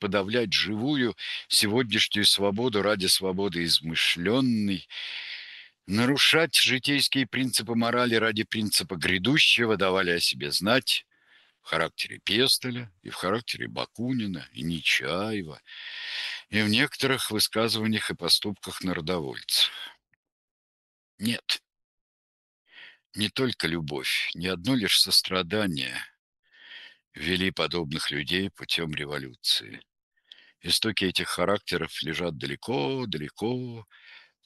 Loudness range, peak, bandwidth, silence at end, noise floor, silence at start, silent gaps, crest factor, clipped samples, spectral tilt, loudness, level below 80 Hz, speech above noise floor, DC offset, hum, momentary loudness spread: 7 LU; -6 dBFS; 13 kHz; 0.25 s; -62 dBFS; 0 s; 20.16-20.23 s, 20.32-21.18 s, 21.84-22.65 s, 23.06-23.10 s, 26.19-26.33 s, 26.39-26.43 s, 27.07-27.11 s, 30.03-30.12 s; 22 dB; under 0.1%; -3 dB/octave; -25 LUFS; -60 dBFS; 35 dB; under 0.1%; none; 14 LU